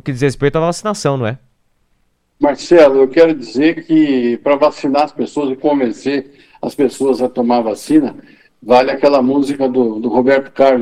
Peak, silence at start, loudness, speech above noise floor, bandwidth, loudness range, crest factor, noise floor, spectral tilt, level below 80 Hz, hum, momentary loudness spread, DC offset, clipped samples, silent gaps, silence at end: 0 dBFS; 0.05 s; -14 LUFS; 48 dB; 12.5 kHz; 4 LU; 14 dB; -61 dBFS; -6 dB/octave; -48 dBFS; none; 9 LU; under 0.1%; under 0.1%; none; 0 s